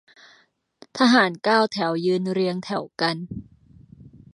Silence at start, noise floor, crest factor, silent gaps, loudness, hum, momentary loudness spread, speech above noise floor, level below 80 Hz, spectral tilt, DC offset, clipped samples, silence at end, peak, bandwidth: 0.95 s; -60 dBFS; 20 dB; none; -22 LUFS; none; 16 LU; 39 dB; -60 dBFS; -5 dB/octave; under 0.1%; under 0.1%; 0.25 s; -4 dBFS; 11 kHz